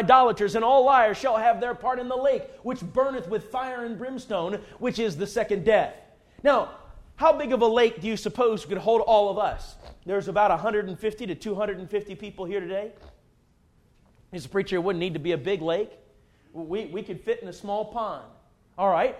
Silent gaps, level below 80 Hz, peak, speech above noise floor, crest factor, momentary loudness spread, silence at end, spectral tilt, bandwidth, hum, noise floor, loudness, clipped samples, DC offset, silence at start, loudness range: none; -52 dBFS; -4 dBFS; 37 dB; 20 dB; 14 LU; 0 s; -5.5 dB/octave; 13 kHz; none; -62 dBFS; -25 LUFS; under 0.1%; under 0.1%; 0 s; 9 LU